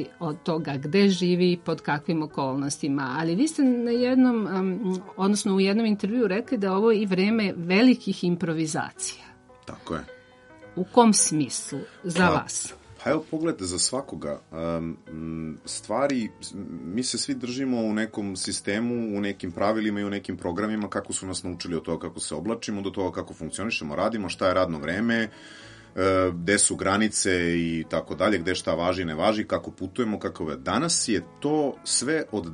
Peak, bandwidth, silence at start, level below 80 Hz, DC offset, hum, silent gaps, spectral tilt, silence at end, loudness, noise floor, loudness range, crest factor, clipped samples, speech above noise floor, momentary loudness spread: -4 dBFS; 11.5 kHz; 0 s; -58 dBFS; under 0.1%; none; none; -4 dB/octave; 0 s; -25 LUFS; -50 dBFS; 6 LU; 22 dB; under 0.1%; 25 dB; 13 LU